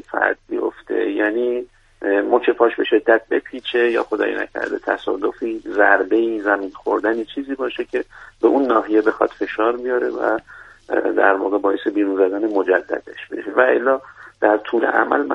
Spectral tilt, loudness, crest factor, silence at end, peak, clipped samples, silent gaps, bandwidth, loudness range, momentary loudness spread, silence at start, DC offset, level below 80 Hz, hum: -5.5 dB/octave; -19 LUFS; 18 dB; 0 s; 0 dBFS; under 0.1%; none; 6.8 kHz; 1 LU; 9 LU; 0.1 s; under 0.1%; -58 dBFS; none